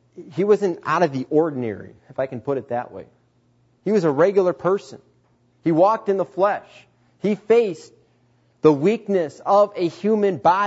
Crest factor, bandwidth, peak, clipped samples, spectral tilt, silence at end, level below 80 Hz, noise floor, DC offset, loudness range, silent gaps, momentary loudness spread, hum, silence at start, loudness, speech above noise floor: 20 dB; 8 kHz; -2 dBFS; under 0.1%; -7.5 dB/octave; 0 s; -68 dBFS; -61 dBFS; under 0.1%; 3 LU; none; 12 LU; none; 0.2 s; -20 LUFS; 41 dB